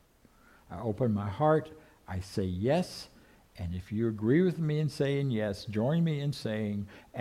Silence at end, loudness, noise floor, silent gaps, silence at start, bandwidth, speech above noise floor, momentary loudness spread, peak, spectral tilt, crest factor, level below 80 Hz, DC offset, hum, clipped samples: 0 s; -31 LUFS; -62 dBFS; none; 0.7 s; 14 kHz; 31 dB; 14 LU; -14 dBFS; -7.5 dB/octave; 18 dB; -58 dBFS; under 0.1%; none; under 0.1%